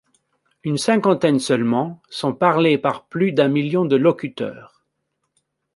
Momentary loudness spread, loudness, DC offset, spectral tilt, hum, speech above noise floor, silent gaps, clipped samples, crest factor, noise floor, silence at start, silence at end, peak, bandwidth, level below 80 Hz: 11 LU; -19 LUFS; under 0.1%; -6 dB/octave; none; 56 dB; none; under 0.1%; 18 dB; -74 dBFS; 0.65 s; 1.1 s; -2 dBFS; 11.5 kHz; -66 dBFS